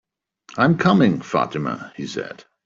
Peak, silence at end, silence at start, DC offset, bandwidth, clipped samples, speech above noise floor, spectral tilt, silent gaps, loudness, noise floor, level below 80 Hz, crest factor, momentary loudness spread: -4 dBFS; 0.25 s; 0.55 s; under 0.1%; 7.6 kHz; under 0.1%; 31 dB; -7 dB/octave; none; -20 LUFS; -50 dBFS; -58 dBFS; 18 dB; 15 LU